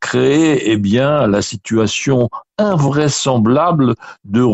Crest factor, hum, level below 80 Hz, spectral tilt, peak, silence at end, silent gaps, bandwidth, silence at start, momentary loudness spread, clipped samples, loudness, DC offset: 12 dB; none; -46 dBFS; -5.5 dB/octave; -2 dBFS; 0 s; none; 8.2 kHz; 0 s; 6 LU; under 0.1%; -14 LUFS; under 0.1%